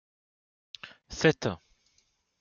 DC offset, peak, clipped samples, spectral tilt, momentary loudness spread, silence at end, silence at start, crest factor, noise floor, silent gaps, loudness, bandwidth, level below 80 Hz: under 0.1%; -10 dBFS; under 0.1%; -5 dB/octave; 21 LU; 0.85 s; 0.85 s; 24 dB; -72 dBFS; none; -28 LUFS; 7.4 kHz; -60 dBFS